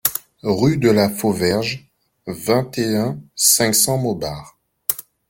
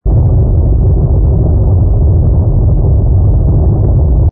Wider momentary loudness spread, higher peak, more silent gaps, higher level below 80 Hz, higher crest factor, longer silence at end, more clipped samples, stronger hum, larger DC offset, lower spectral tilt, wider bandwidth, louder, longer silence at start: first, 14 LU vs 1 LU; about the same, 0 dBFS vs -2 dBFS; neither; second, -52 dBFS vs -10 dBFS; first, 20 dB vs 6 dB; first, 0.3 s vs 0 s; neither; neither; neither; second, -4 dB/octave vs -17.5 dB/octave; first, 17 kHz vs 1.5 kHz; second, -18 LUFS vs -10 LUFS; about the same, 0.05 s vs 0.05 s